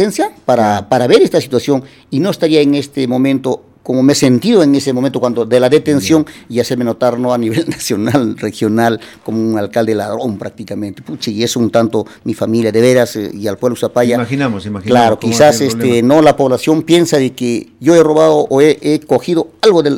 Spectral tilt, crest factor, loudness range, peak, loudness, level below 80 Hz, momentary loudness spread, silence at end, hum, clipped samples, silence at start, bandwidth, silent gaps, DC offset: -5.5 dB/octave; 12 dB; 5 LU; 0 dBFS; -12 LUFS; -52 dBFS; 10 LU; 0 s; none; 0.1%; 0 s; 17.5 kHz; none; under 0.1%